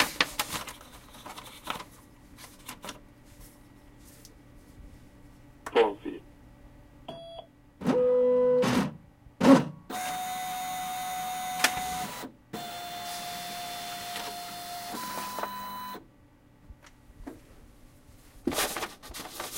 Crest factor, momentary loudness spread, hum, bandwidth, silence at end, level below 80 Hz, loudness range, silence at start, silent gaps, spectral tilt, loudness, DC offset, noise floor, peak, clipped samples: 28 dB; 24 LU; none; 16 kHz; 0 s; -58 dBFS; 18 LU; 0 s; none; -4 dB/octave; -30 LUFS; under 0.1%; -58 dBFS; -4 dBFS; under 0.1%